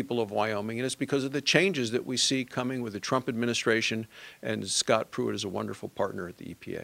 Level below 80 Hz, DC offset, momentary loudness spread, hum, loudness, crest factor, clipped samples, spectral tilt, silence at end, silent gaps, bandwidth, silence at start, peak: -70 dBFS; under 0.1%; 12 LU; none; -29 LUFS; 24 dB; under 0.1%; -3.5 dB/octave; 0 s; none; 16 kHz; 0 s; -4 dBFS